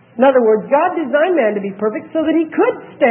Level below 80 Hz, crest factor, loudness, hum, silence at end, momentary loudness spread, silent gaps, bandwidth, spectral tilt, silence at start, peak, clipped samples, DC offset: -68 dBFS; 14 dB; -15 LUFS; none; 0 s; 7 LU; none; 3.6 kHz; -11 dB/octave; 0.15 s; 0 dBFS; under 0.1%; under 0.1%